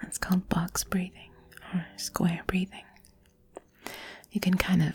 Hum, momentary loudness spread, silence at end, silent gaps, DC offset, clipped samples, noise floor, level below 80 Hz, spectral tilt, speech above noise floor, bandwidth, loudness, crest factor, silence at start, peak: none; 23 LU; 0 s; none; under 0.1%; under 0.1%; -61 dBFS; -50 dBFS; -5 dB/octave; 32 dB; 19.5 kHz; -30 LUFS; 24 dB; 0 s; -8 dBFS